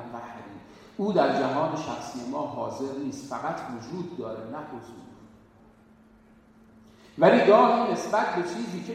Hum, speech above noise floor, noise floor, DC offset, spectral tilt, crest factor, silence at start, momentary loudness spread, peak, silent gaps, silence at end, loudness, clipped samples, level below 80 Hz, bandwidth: none; 30 dB; -56 dBFS; under 0.1%; -6 dB/octave; 24 dB; 0 s; 23 LU; -4 dBFS; none; 0 s; -26 LUFS; under 0.1%; -66 dBFS; 13 kHz